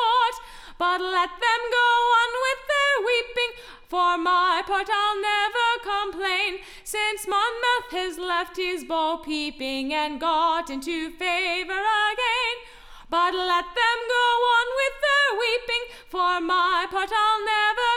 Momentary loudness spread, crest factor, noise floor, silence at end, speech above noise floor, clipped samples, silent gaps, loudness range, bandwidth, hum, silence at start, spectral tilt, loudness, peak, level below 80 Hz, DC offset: 8 LU; 16 dB; -44 dBFS; 0 s; 21 dB; under 0.1%; none; 4 LU; 16.5 kHz; none; 0 s; -0.5 dB/octave; -23 LUFS; -8 dBFS; -52 dBFS; under 0.1%